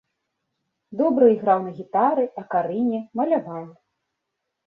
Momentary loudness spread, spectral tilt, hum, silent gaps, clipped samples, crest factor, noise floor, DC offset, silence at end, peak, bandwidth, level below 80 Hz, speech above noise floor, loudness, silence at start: 10 LU; -10 dB/octave; none; none; under 0.1%; 18 dB; -80 dBFS; under 0.1%; 0.95 s; -4 dBFS; 4.2 kHz; -68 dBFS; 59 dB; -22 LUFS; 0.9 s